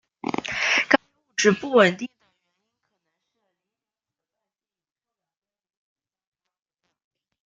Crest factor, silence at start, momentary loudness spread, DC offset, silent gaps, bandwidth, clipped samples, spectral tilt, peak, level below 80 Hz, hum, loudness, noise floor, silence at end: 26 dB; 0.25 s; 13 LU; under 0.1%; none; 9.4 kHz; under 0.1%; -3.5 dB/octave; -2 dBFS; -68 dBFS; none; -21 LUFS; under -90 dBFS; 5.4 s